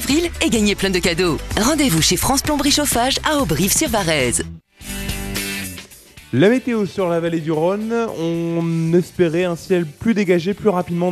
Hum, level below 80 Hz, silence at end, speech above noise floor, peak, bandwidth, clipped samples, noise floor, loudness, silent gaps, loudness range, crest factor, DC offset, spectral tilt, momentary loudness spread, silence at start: none; -36 dBFS; 0 s; 25 dB; -2 dBFS; 14 kHz; under 0.1%; -42 dBFS; -18 LUFS; none; 4 LU; 16 dB; under 0.1%; -4 dB/octave; 9 LU; 0 s